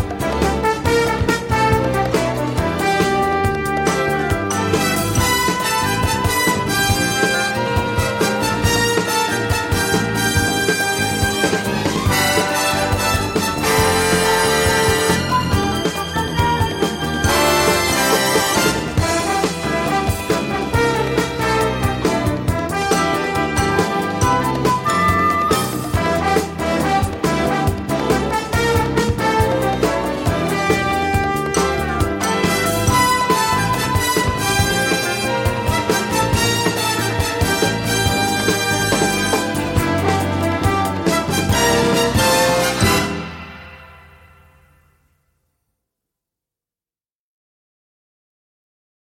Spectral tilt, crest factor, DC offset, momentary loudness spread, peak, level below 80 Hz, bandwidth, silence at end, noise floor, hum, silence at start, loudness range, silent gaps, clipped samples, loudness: -4 dB/octave; 16 dB; under 0.1%; 5 LU; -2 dBFS; -34 dBFS; 17 kHz; 5.05 s; under -90 dBFS; none; 0 s; 2 LU; none; under 0.1%; -17 LUFS